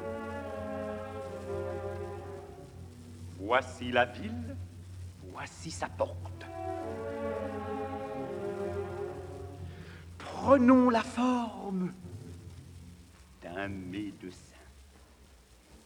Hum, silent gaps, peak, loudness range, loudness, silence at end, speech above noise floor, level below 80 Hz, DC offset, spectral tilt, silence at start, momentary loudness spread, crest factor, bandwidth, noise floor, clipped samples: none; none; -8 dBFS; 12 LU; -33 LUFS; 0.1 s; 28 dB; -58 dBFS; under 0.1%; -6 dB/octave; 0 s; 19 LU; 26 dB; 12 kHz; -58 dBFS; under 0.1%